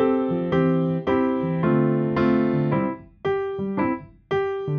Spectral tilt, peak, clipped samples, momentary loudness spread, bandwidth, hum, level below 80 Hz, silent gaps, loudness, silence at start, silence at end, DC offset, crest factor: -10 dB/octave; -8 dBFS; under 0.1%; 7 LU; 6 kHz; none; -54 dBFS; none; -23 LUFS; 0 s; 0 s; under 0.1%; 14 dB